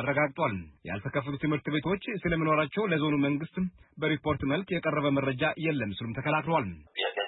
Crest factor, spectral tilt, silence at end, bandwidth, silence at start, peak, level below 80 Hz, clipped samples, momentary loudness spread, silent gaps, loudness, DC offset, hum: 16 dB; -10.5 dB/octave; 0 s; 4.1 kHz; 0 s; -14 dBFS; -56 dBFS; under 0.1%; 7 LU; none; -30 LUFS; under 0.1%; none